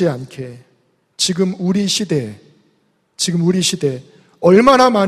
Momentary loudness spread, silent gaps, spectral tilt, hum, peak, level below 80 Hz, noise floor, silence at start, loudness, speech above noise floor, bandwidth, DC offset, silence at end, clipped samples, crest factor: 21 LU; none; -4.5 dB/octave; none; 0 dBFS; -52 dBFS; -61 dBFS; 0 s; -15 LUFS; 46 dB; 14.5 kHz; under 0.1%; 0 s; under 0.1%; 16 dB